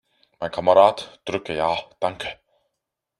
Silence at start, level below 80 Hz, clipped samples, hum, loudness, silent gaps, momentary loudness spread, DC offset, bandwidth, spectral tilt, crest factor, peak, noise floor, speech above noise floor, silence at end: 0.4 s; -60 dBFS; under 0.1%; none; -21 LUFS; none; 17 LU; under 0.1%; 11 kHz; -5 dB/octave; 22 dB; -2 dBFS; -82 dBFS; 61 dB; 0.85 s